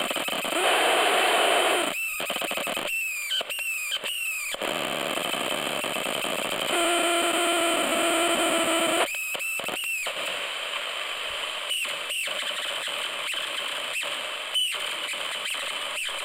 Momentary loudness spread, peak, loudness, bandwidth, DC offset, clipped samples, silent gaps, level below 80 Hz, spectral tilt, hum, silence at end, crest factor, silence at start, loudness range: 8 LU; -10 dBFS; -25 LUFS; 17 kHz; under 0.1%; under 0.1%; none; -66 dBFS; -0.5 dB/octave; none; 0 s; 18 dB; 0 s; 5 LU